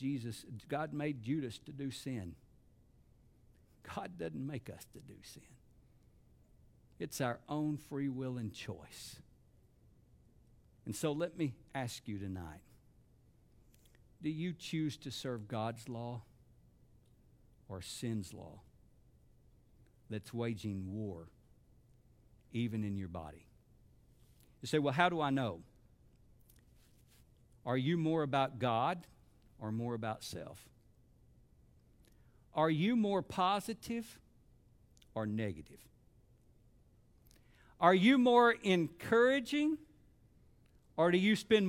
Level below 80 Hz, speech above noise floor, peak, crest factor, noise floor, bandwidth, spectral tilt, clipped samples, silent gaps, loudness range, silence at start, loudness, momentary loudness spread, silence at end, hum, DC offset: -68 dBFS; 31 dB; -12 dBFS; 26 dB; -67 dBFS; 16.5 kHz; -6 dB/octave; under 0.1%; none; 15 LU; 0 s; -36 LUFS; 21 LU; 0 s; none; under 0.1%